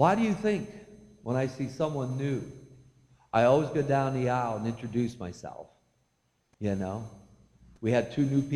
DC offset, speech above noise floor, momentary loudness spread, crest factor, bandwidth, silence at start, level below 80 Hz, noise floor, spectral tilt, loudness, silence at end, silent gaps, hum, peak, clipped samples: under 0.1%; 46 dB; 19 LU; 22 dB; 11 kHz; 0 s; -60 dBFS; -74 dBFS; -7.5 dB/octave; -29 LUFS; 0 s; none; none; -8 dBFS; under 0.1%